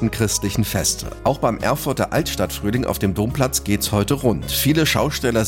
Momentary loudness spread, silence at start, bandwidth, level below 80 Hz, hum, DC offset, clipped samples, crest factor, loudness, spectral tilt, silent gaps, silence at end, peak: 4 LU; 0 s; 17 kHz; -36 dBFS; none; under 0.1%; under 0.1%; 14 dB; -20 LUFS; -4.5 dB/octave; none; 0 s; -6 dBFS